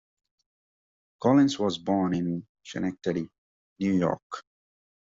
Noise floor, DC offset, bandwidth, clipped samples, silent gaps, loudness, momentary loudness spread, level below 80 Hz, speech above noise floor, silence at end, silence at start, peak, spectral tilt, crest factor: under -90 dBFS; under 0.1%; 7.8 kHz; under 0.1%; 2.49-2.55 s, 3.38-3.76 s, 4.22-4.30 s; -27 LUFS; 17 LU; -66 dBFS; over 64 dB; 0.7 s; 1.2 s; -8 dBFS; -6 dB/octave; 20 dB